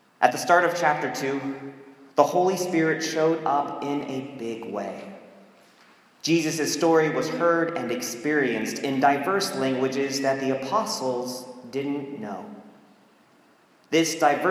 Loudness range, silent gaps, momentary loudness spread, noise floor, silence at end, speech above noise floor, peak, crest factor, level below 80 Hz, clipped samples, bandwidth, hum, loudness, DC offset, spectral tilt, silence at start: 6 LU; none; 13 LU; -58 dBFS; 0 s; 34 dB; -2 dBFS; 24 dB; -78 dBFS; under 0.1%; 16 kHz; none; -24 LUFS; under 0.1%; -4 dB/octave; 0.2 s